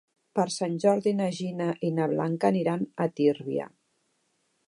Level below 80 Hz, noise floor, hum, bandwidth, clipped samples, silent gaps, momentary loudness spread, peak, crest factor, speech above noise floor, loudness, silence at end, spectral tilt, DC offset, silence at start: -76 dBFS; -73 dBFS; none; 11.5 kHz; under 0.1%; none; 8 LU; -10 dBFS; 18 dB; 47 dB; -27 LUFS; 1 s; -6.5 dB/octave; under 0.1%; 0.35 s